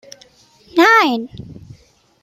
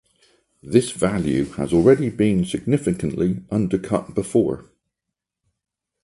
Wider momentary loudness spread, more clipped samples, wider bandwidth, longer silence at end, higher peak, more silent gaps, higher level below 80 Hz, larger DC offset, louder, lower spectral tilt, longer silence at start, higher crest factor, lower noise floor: first, 22 LU vs 7 LU; neither; first, 16 kHz vs 11.5 kHz; second, 0.7 s vs 1.45 s; about the same, -2 dBFS vs -2 dBFS; neither; second, -54 dBFS vs -46 dBFS; neither; first, -13 LUFS vs -21 LUFS; second, -4 dB/octave vs -7 dB/octave; about the same, 0.75 s vs 0.65 s; about the same, 16 dB vs 20 dB; second, -50 dBFS vs -84 dBFS